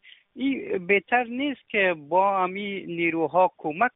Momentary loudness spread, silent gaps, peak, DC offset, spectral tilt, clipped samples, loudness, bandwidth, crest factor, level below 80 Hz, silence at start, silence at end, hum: 8 LU; none; -8 dBFS; under 0.1%; -3 dB/octave; under 0.1%; -24 LUFS; 4 kHz; 18 dB; -68 dBFS; 0.35 s; 0.05 s; none